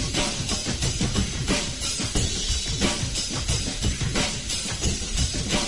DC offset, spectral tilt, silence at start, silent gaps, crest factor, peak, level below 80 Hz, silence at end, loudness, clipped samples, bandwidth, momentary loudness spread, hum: 0.5%; -3 dB/octave; 0 s; none; 18 dB; -8 dBFS; -32 dBFS; 0 s; -25 LUFS; under 0.1%; 11.5 kHz; 2 LU; none